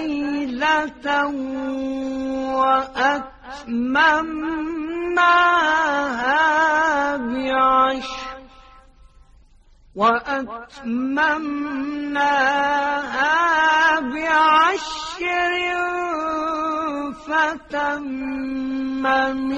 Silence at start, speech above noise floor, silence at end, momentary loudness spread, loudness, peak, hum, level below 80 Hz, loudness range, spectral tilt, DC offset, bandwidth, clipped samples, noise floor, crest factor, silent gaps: 0 s; 31 dB; 0 s; 11 LU; -20 LUFS; -4 dBFS; none; -50 dBFS; 6 LU; -3 dB/octave; under 0.1%; 9.4 kHz; under 0.1%; -51 dBFS; 18 dB; none